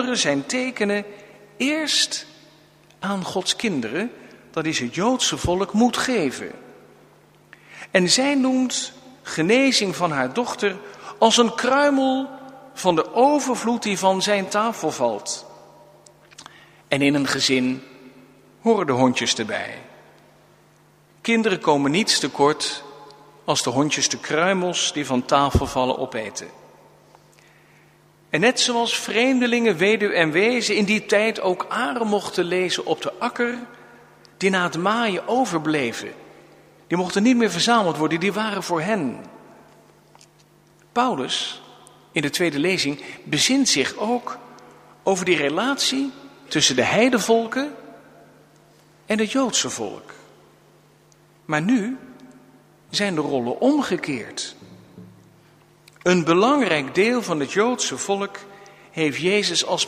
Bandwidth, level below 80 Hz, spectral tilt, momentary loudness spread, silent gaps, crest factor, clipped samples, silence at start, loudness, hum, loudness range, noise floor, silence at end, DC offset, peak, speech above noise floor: 15.5 kHz; -52 dBFS; -3.5 dB/octave; 13 LU; none; 22 dB; under 0.1%; 0 s; -21 LUFS; none; 6 LU; -55 dBFS; 0 s; under 0.1%; 0 dBFS; 34 dB